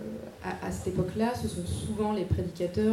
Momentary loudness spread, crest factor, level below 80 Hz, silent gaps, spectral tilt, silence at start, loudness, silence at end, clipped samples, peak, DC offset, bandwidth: 8 LU; 16 dB; -46 dBFS; none; -6.5 dB/octave; 0 s; -32 LUFS; 0 s; under 0.1%; -14 dBFS; under 0.1%; 16 kHz